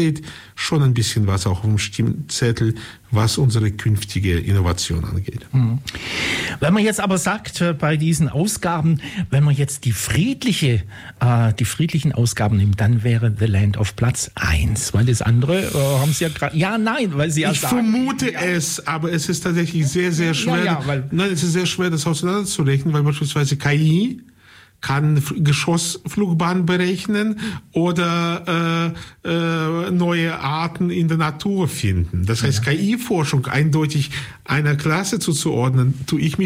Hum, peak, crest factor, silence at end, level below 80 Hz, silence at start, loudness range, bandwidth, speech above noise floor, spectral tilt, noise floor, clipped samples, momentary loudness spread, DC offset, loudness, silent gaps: none; -8 dBFS; 12 dB; 0 s; -40 dBFS; 0 s; 2 LU; 16 kHz; 30 dB; -5.5 dB/octave; -48 dBFS; under 0.1%; 5 LU; under 0.1%; -19 LUFS; none